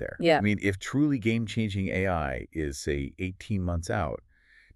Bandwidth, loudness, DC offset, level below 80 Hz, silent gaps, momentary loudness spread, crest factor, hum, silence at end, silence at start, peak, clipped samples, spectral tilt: 12.5 kHz; -28 LUFS; under 0.1%; -44 dBFS; none; 10 LU; 20 dB; none; 0.55 s; 0 s; -8 dBFS; under 0.1%; -6 dB/octave